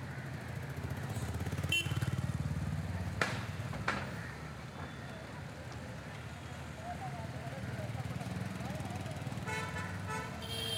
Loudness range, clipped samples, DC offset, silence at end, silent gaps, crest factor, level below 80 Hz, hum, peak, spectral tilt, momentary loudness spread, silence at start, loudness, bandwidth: 7 LU; under 0.1%; under 0.1%; 0 s; none; 28 dB; -54 dBFS; none; -10 dBFS; -5 dB/octave; 10 LU; 0 s; -40 LUFS; 16 kHz